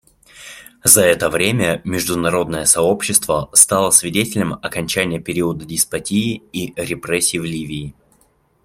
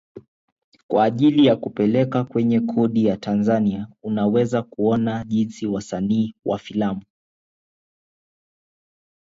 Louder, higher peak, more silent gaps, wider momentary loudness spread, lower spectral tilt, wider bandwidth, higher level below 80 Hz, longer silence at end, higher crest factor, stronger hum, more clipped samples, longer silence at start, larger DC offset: first, -16 LUFS vs -21 LUFS; first, 0 dBFS vs -4 dBFS; second, none vs 0.28-0.56 s, 0.64-0.72 s, 0.83-0.89 s; first, 15 LU vs 9 LU; second, -3 dB/octave vs -7.5 dB/octave; first, 16.5 kHz vs 7.8 kHz; first, -48 dBFS vs -56 dBFS; second, 0.75 s vs 2.35 s; about the same, 18 dB vs 16 dB; neither; neither; first, 0.35 s vs 0.15 s; neither